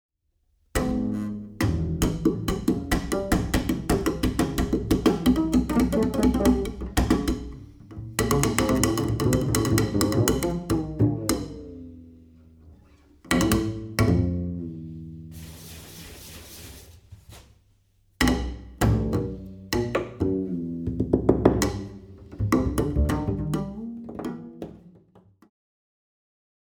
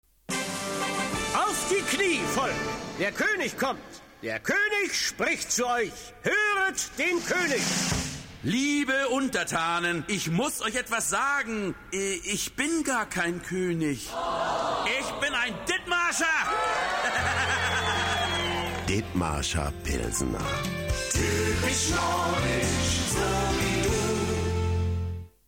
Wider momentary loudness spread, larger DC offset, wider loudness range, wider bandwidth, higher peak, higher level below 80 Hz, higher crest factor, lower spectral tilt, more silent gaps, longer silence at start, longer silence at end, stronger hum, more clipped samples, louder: first, 19 LU vs 6 LU; neither; first, 9 LU vs 2 LU; first, over 20 kHz vs 16.5 kHz; first, -2 dBFS vs -12 dBFS; first, -36 dBFS vs -42 dBFS; first, 24 dB vs 14 dB; first, -5.5 dB/octave vs -3.5 dB/octave; neither; first, 0.75 s vs 0.3 s; first, 1.9 s vs 0.2 s; neither; neither; about the same, -25 LUFS vs -27 LUFS